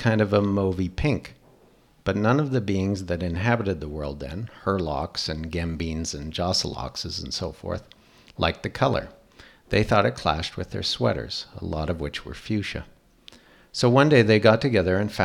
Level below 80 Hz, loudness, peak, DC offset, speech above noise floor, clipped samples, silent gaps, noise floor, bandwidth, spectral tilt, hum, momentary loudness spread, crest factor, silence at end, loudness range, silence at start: -42 dBFS; -25 LUFS; -2 dBFS; under 0.1%; 33 dB; under 0.1%; none; -57 dBFS; 14 kHz; -5.5 dB/octave; none; 14 LU; 22 dB; 0 s; 6 LU; 0 s